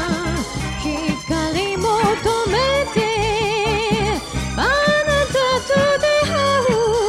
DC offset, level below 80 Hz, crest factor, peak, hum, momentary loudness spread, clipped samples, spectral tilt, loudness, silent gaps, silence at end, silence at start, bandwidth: under 0.1%; -34 dBFS; 14 dB; -4 dBFS; none; 7 LU; under 0.1%; -4 dB/octave; -18 LUFS; none; 0 s; 0 s; 15.5 kHz